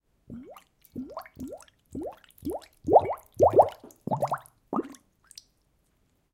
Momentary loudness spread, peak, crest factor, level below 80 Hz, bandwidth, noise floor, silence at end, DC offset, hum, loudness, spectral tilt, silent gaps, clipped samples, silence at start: 23 LU; -6 dBFS; 24 dB; -60 dBFS; 17 kHz; -70 dBFS; 1.4 s; under 0.1%; none; -26 LUFS; -7 dB/octave; none; under 0.1%; 0.3 s